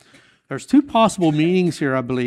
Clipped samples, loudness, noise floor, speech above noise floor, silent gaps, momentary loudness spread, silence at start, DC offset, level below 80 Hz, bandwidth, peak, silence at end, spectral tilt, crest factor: under 0.1%; -18 LUFS; -52 dBFS; 35 dB; none; 10 LU; 0.5 s; under 0.1%; -56 dBFS; 12.5 kHz; -4 dBFS; 0 s; -6 dB/octave; 16 dB